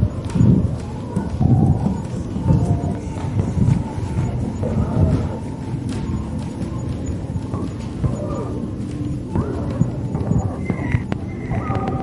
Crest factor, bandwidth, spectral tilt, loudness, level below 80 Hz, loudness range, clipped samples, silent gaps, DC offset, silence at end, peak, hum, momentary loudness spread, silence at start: 18 dB; 11.5 kHz; -8.5 dB/octave; -22 LUFS; -32 dBFS; 6 LU; under 0.1%; none; under 0.1%; 0 s; -2 dBFS; none; 9 LU; 0 s